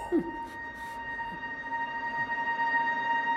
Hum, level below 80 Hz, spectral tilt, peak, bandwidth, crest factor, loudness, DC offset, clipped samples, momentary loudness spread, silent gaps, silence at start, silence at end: none; -60 dBFS; -5 dB/octave; -18 dBFS; 13.5 kHz; 14 dB; -31 LUFS; under 0.1%; under 0.1%; 11 LU; none; 0 s; 0 s